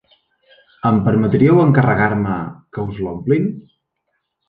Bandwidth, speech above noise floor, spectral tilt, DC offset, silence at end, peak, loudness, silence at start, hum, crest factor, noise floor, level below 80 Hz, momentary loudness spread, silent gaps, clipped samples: 4.7 kHz; 57 dB; -11 dB/octave; under 0.1%; 0.9 s; -2 dBFS; -16 LUFS; 0.85 s; none; 16 dB; -72 dBFS; -46 dBFS; 14 LU; none; under 0.1%